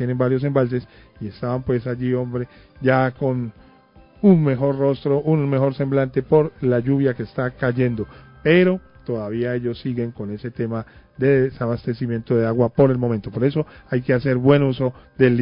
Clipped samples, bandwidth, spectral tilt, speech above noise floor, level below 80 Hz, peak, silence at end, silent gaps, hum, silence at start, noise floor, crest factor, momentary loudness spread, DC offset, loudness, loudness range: under 0.1%; 5.4 kHz; -13 dB/octave; 30 dB; -48 dBFS; -2 dBFS; 0 s; none; none; 0 s; -50 dBFS; 18 dB; 12 LU; under 0.1%; -20 LUFS; 4 LU